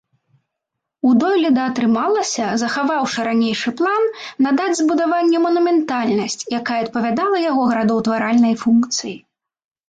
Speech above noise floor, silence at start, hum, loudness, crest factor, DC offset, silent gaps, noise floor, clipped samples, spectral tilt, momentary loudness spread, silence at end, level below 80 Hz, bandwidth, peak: 63 dB; 1.05 s; none; -17 LUFS; 12 dB; under 0.1%; none; -80 dBFS; under 0.1%; -4 dB/octave; 6 LU; 0.75 s; -62 dBFS; 9.2 kHz; -6 dBFS